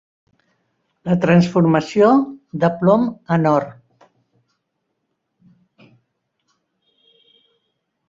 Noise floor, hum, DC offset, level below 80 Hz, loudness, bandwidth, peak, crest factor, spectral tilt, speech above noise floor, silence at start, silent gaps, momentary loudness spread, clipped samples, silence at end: -74 dBFS; none; under 0.1%; -60 dBFS; -16 LUFS; 7.6 kHz; -2 dBFS; 18 dB; -8 dB/octave; 58 dB; 1.05 s; none; 8 LU; under 0.1%; 4.35 s